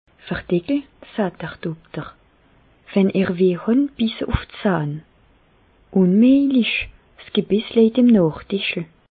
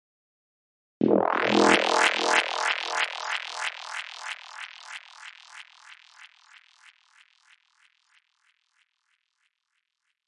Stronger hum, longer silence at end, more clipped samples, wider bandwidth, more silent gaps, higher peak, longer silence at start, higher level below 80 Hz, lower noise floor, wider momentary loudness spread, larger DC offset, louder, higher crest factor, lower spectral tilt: neither; second, 0.3 s vs 4 s; neither; second, 4.8 kHz vs 11.5 kHz; neither; about the same, -4 dBFS vs -2 dBFS; second, 0.25 s vs 1 s; first, -42 dBFS vs -74 dBFS; second, -56 dBFS vs -79 dBFS; second, 16 LU vs 25 LU; neither; first, -19 LUFS vs -24 LUFS; second, 16 dB vs 26 dB; first, -12 dB/octave vs -3 dB/octave